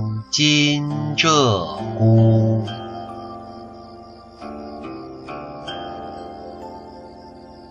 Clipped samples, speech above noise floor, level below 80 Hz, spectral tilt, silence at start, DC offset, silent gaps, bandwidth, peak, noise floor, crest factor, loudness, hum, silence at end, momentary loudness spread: under 0.1%; 24 dB; -50 dBFS; -5 dB/octave; 0 s; under 0.1%; none; 7.6 kHz; -2 dBFS; -41 dBFS; 20 dB; -18 LUFS; none; 0 s; 25 LU